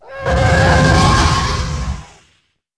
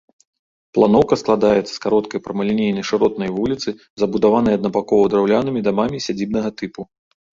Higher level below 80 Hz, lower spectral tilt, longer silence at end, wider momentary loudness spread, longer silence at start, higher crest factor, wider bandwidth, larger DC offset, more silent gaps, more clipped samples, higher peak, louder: first, -22 dBFS vs -50 dBFS; second, -5 dB/octave vs -6.5 dB/octave; first, 0.75 s vs 0.5 s; first, 13 LU vs 10 LU; second, 0.05 s vs 0.75 s; about the same, 14 dB vs 16 dB; first, 11 kHz vs 7.6 kHz; first, 0.6% vs under 0.1%; second, none vs 3.90-3.97 s; neither; about the same, 0 dBFS vs -2 dBFS; first, -13 LUFS vs -18 LUFS